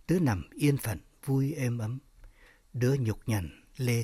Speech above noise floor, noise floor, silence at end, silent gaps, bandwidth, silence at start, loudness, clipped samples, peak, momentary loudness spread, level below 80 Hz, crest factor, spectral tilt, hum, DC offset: 27 dB; -56 dBFS; 0 s; none; 16 kHz; 0.1 s; -31 LUFS; under 0.1%; -14 dBFS; 11 LU; -54 dBFS; 16 dB; -6.5 dB/octave; none; under 0.1%